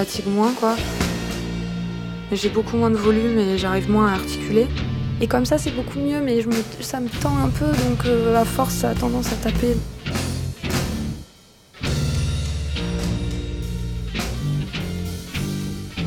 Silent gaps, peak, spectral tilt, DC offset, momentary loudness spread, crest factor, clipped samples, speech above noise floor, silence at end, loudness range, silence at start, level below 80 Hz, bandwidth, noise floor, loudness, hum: none; -4 dBFS; -6 dB/octave; under 0.1%; 10 LU; 16 dB; under 0.1%; 29 dB; 0 s; 6 LU; 0 s; -32 dBFS; 18 kHz; -49 dBFS; -22 LUFS; none